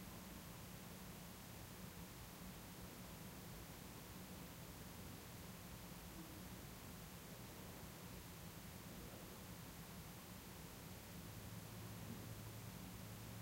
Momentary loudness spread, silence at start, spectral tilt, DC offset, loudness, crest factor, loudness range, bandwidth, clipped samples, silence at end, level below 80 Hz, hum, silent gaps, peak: 2 LU; 0 s; -4.5 dB/octave; under 0.1%; -55 LUFS; 16 dB; 1 LU; 16 kHz; under 0.1%; 0 s; -66 dBFS; none; none; -40 dBFS